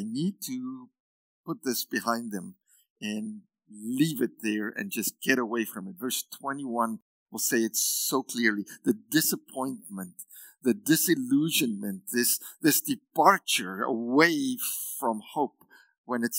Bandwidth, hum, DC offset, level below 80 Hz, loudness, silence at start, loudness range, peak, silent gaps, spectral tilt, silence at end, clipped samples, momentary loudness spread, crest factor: 16.5 kHz; none; under 0.1%; -86 dBFS; -28 LUFS; 0 s; 7 LU; -4 dBFS; 1.00-1.44 s, 2.90-2.96 s, 7.02-7.26 s, 15.98-16.04 s; -3 dB/octave; 0 s; under 0.1%; 16 LU; 24 dB